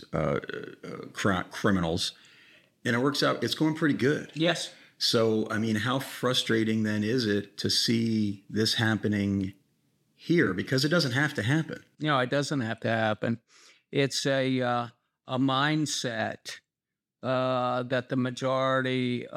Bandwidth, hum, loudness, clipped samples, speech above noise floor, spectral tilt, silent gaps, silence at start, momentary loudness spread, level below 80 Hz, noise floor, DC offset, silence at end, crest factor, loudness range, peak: 16 kHz; none; -27 LUFS; under 0.1%; 61 dB; -5 dB/octave; none; 0 s; 9 LU; -64 dBFS; -89 dBFS; under 0.1%; 0 s; 18 dB; 3 LU; -10 dBFS